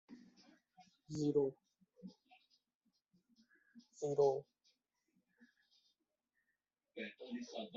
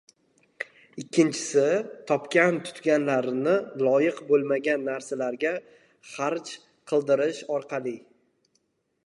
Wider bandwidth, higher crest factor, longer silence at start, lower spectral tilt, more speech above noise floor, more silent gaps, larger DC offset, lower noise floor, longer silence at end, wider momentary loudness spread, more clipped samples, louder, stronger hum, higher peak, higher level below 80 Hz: second, 7.6 kHz vs 11.5 kHz; about the same, 22 dB vs 20 dB; second, 0.1 s vs 0.6 s; about the same, -6 dB/octave vs -5 dB/octave; first, 51 dB vs 47 dB; first, 2.75-2.81 s vs none; neither; first, -89 dBFS vs -72 dBFS; second, 0 s vs 1.1 s; first, 24 LU vs 15 LU; neither; second, -40 LUFS vs -26 LUFS; neither; second, -22 dBFS vs -8 dBFS; about the same, -84 dBFS vs -80 dBFS